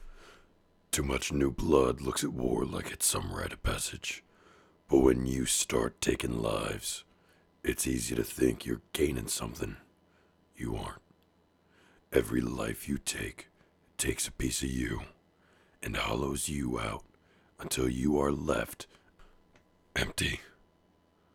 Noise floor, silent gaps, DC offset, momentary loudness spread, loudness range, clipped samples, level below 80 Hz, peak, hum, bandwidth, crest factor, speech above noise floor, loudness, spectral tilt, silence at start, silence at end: -68 dBFS; none; under 0.1%; 13 LU; 6 LU; under 0.1%; -46 dBFS; -10 dBFS; none; 18.5 kHz; 22 dB; 37 dB; -32 LUFS; -4 dB/octave; 0 s; 0.9 s